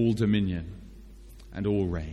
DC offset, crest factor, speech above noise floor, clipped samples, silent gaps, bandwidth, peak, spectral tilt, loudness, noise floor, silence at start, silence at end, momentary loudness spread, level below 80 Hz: under 0.1%; 14 dB; 20 dB; under 0.1%; none; 12 kHz; -14 dBFS; -8 dB/octave; -28 LUFS; -47 dBFS; 0 s; 0 s; 20 LU; -44 dBFS